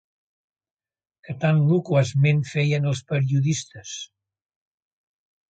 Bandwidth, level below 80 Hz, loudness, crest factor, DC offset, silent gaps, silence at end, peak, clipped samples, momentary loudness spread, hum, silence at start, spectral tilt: 8.8 kHz; -62 dBFS; -22 LUFS; 18 dB; under 0.1%; none; 1.45 s; -6 dBFS; under 0.1%; 15 LU; none; 1.3 s; -6.5 dB/octave